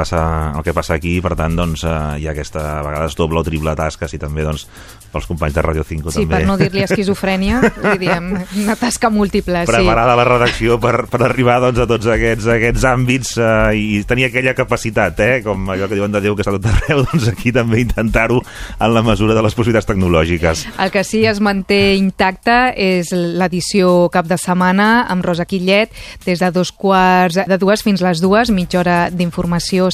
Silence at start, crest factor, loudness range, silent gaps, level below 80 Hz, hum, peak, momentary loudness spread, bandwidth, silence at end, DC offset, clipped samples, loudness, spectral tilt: 0 s; 14 dB; 5 LU; none; -28 dBFS; none; 0 dBFS; 8 LU; 15 kHz; 0 s; under 0.1%; under 0.1%; -15 LUFS; -5.5 dB/octave